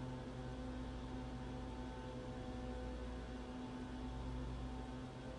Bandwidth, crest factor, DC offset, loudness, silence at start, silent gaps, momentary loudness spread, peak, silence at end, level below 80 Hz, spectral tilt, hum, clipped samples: 11 kHz; 12 dB; under 0.1%; -48 LUFS; 0 s; none; 2 LU; -34 dBFS; 0 s; -52 dBFS; -7 dB/octave; none; under 0.1%